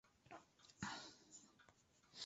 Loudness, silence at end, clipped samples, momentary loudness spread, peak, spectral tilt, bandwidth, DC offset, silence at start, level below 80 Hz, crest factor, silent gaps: -56 LUFS; 0 s; under 0.1%; 15 LU; -34 dBFS; -2 dB/octave; 8 kHz; under 0.1%; 0.05 s; -80 dBFS; 26 dB; none